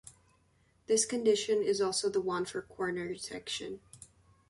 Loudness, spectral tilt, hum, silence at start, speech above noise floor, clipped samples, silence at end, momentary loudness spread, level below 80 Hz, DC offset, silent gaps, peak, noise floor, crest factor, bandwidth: -32 LUFS; -3 dB/octave; none; 0.05 s; 37 dB; under 0.1%; 0.45 s; 11 LU; -70 dBFS; under 0.1%; none; -16 dBFS; -69 dBFS; 18 dB; 11.5 kHz